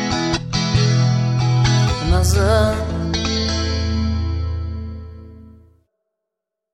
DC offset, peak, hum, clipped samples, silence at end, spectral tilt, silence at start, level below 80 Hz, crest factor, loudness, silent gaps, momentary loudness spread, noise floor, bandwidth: under 0.1%; -4 dBFS; none; under 0.1%; 1.25 s; -5.5 dB/octave; 0 s; -28 dBFS; 16 dB; -18 LUFS; none; 11 LU; -82 dBFS; 14.5 kHz